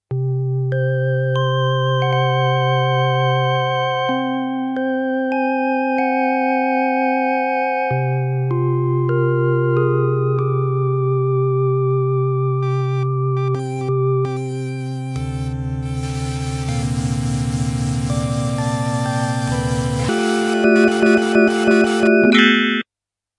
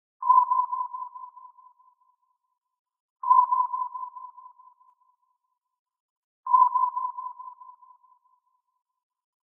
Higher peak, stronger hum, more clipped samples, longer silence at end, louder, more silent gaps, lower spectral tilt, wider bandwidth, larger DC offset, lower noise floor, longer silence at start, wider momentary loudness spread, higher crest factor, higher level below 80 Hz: first, 0 dBFS vs -8 dBFS; neither; neither; second, 0.55 s vs 1.75 s; first, -18 LUFS vs -24 LUFS; second, none vs 2.79-2.85 s, 3.00-3.16 s, 5.79-5.86 s, 6.00-6.43 s; first, -6.5 dB/octave vs 24.5 dB/octave; first, 11.5 kHz vs 1.5 kHz; neither; first, -87 dBFS vs -78 dBFS; about the same, 0.1 s vs 0.2 s; second, 9 LU vs 24 LU; about the same, 18 dB vs 20 dB; first, -40 dBFS vs under -90 dBFS